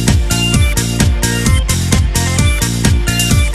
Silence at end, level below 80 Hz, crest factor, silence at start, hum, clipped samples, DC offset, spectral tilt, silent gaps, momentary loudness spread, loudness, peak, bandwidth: 0 s; -16 dBFS; 12 dB; 0 s; none; under 0.1%; 0.4%; -4 dB/octave; none; 2 LU; -13 LUFS; 0 dBFS; 14.5 kHz